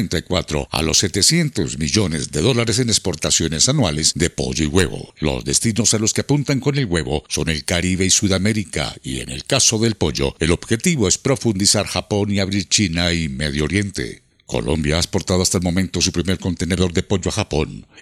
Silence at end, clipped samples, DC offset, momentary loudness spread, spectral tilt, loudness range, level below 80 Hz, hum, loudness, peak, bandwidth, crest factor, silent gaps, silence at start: 0 s; under 0.1%; under 0.1%; 7 LU; -3.5 dB/octave; 3 LU; -38 dBFS; none; -18 LUFS; 0 dBFS; 15.5 kHz; 18 dB; none; 0 s